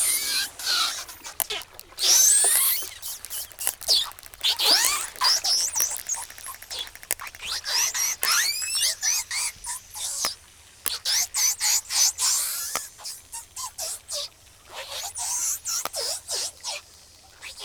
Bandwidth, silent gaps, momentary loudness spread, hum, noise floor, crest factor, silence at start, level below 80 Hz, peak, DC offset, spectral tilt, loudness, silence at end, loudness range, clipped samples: over 20 kHz; none; 16 LU; none; -51 dBFS; 26 dB; 0 s; -60 dBFS; 0 dBFS; under 0.1%; 3 dB/octave; -23 LUFS; 0 s; 8 LU; under 0.1%